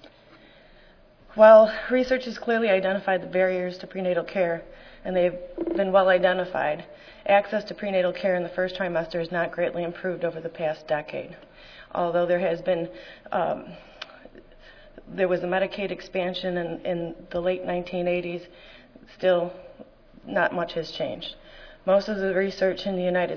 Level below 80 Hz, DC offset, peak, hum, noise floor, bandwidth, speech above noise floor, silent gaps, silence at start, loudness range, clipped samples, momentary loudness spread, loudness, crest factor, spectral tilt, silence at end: -54 dBFS; under 0.1%; -4 dBFS; none; -53 dBFS; 5.4 kHz; 29 dB; none; 0.05 s; 9 LU; under 0.1%; 14 LU; -25 LUFS; 22 dB; -6.5 dB/octave; 0 s